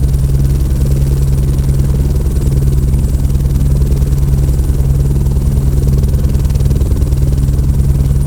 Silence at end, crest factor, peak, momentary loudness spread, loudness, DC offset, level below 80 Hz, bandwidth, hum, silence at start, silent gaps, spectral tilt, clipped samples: 0 s; 10 dB; 0 dBFS; 1 LU; -13 LUFS; under 0.1%; -12 dBFS; 17 kHz; none; 0 s; none; -8 dB/octave; 0.3%